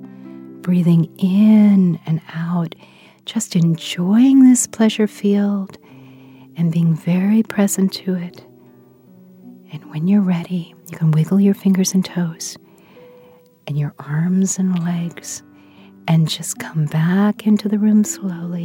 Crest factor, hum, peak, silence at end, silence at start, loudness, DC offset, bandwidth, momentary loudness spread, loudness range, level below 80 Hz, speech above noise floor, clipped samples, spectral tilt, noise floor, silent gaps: 14 dB; none; -2 dBFS; 0 s; 0 s; -17 LUFS; under 0.1%; 16.5 kHz; 18 LU; 6 LU; -68 dBFS; 32 dB; under 0.1%; -6 dB/octave; -48 dBFS; none